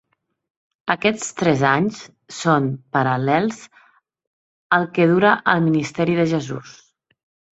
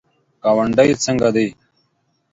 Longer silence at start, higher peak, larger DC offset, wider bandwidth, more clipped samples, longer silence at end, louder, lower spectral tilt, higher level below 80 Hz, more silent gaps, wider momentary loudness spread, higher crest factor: first, 0.85 s vs 0.45 s; about the same, 0 dBFS vs 0 dBFS; neither; about the same, 8.2 kHz vs 8 kHz; neither; about the same, 0.85 s vs 0.8 s; about the same, -19 LUFS vs -17 LUFS; about the same, -5.5 dB/octave vs -5 dB/octave; second, -60 dBFS vs -50 dBFS; first, 4.27-4.70 s vs none; first, 14 LU vs 8 LU; about the same, 20 dB vs 18 dB